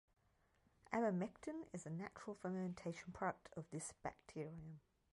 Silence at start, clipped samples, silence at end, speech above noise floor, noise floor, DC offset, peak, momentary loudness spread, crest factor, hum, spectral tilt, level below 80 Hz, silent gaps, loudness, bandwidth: 0.9 s; under 0.1%; 0.35 s; 32 dB; -79 dBFS; under 0.1%; -26 dBFS; 11 LU; 22 dB; none; -6 dB/octave; -76 dBFS; none; -47 LUFS; 11.5 kHz